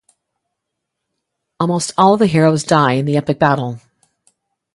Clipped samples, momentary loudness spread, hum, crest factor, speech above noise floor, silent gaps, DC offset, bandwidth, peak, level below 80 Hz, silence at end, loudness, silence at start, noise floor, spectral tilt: under 0.1%; 9 LU; none; 18 dB; 64 dB; none; under 0.1%; 11.5 kHz; 0 dBFS; -56 dBFS; 0.95 s; -14 LUFS; 1.6 s; -77 dBFS; -6 dB/octave